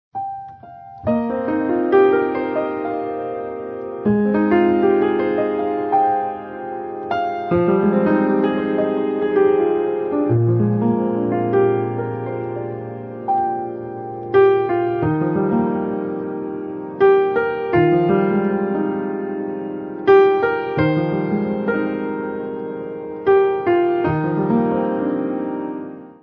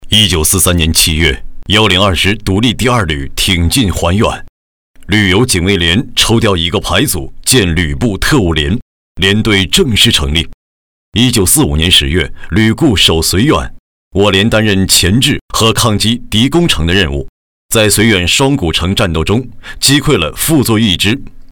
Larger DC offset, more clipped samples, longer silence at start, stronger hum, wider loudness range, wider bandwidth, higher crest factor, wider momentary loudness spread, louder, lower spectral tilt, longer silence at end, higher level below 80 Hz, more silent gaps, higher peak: neither; neither; first, 0.15 s vs 0 s; neither; about the same, 2 LU vs 2 LU; second, 5.2 kHz vs over 20 kHz; first, 16 dB vs 10 dB; first, 13 LU vs 7 LU; second, -19 LUFS vs -10 LUFS; first, -10.5 dB/octave vs -3.5 dB/octave; about the same, 0.1 s vs 0.05 s; second, -50 dBFS vs -24 dBFS; second, none vs 4.49-4.94 s, 8.82-9.15 s, 10.54-11.12 s, 13.79-14.11 s, 15.41-15.48 s, 17.29-17.69 s; about the same, -2 dBFS vs 0 dBFS